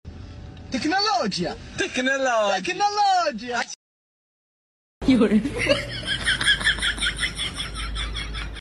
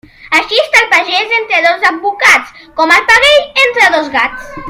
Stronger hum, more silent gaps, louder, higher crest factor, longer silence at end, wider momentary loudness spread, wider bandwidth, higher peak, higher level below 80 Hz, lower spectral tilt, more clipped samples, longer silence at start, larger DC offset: neither; first, 3.76-5.01 s vs none; second, -23 LUFS vs -8 LUFS; first, 18 dB vs 10 dB; about the same, 0 s vs 0 s; first, 12 LU vs 8 LU; second, 12 kHz vs over 20 kHz; second, -6 dBFS vs 0 dBFS; about the same, -38 dBFS vs -42 dBFS; first, -3.5 dB/octave vs -1 dB/octave; second, under 0.1% vs 1%; second, 0.05 s vs 0.25 s; neither